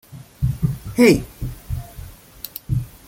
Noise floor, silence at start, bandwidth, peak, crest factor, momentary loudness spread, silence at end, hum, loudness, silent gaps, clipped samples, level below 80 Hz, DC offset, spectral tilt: -39 dBFS; 0.1 s; 17 kHz; -2 dBFS; 20 dB; 22 LU; 0.2 s; none; -20 LUFS; none; under 0.1%; -36 dBFS; under 0.1%; -6.5 dB/octave